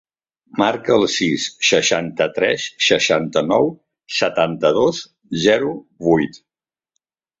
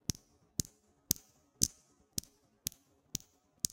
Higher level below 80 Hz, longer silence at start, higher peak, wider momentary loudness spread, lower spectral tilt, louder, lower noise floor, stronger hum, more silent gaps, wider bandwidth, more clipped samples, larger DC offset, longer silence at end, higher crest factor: about the same, -56 dBFS vs -58 dBFS; about the same, 0.55 s vs 0.6 s; about the same, -2 dBFS vs -2 dBFS; about the same, 8 LU vs 10 LU; first, -3.5 dB/octave vs -2 dB/octave; first, -18 LUFS vs -38 LUFS; first, -75 dBFS vs -64 dBFS; neither; neither; second, 8 kHz vs 17 kHz; neither; neither; first, 1.05 s vs 0.55 s; second, 18 dB vs 40 dB